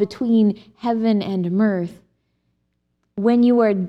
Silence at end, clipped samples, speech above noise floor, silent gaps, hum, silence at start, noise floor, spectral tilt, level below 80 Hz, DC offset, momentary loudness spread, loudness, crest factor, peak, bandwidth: 0 s; under 0.1%; 52 dB; none; none; 0 s; -70 dBFS; -9 dB/octave; -62 dBFS; under 0.1%; 11 LU; -19 LUFS; 14 dB; -6 dBFS; 6 kHz